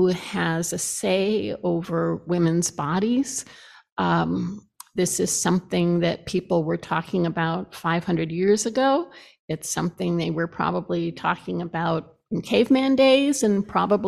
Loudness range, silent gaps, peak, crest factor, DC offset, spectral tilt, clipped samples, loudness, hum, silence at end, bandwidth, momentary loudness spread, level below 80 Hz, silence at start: 3 LU; 3.92-3.96 s, 9.39-9.48 s; -6 dBFS; 18 dB; under 0.1%; -5 dB/octave; under 0.1%; -23 LUFS; none; 0 s; 14 kHz; 9 LU; -58 dBFS; 0 s